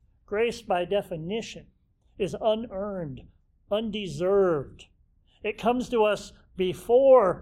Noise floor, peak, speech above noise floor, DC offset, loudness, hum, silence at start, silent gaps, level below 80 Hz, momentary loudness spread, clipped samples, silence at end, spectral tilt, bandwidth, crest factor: -62 dBFS; -8 dBFS; 36 dB; under 0.1%; -26 LUFS; none; 0.3 s; none; -54 dBFS; 15 LU; under 0.1%; 0 s; -6 dB/octave; 13.5 kHz; 18 dB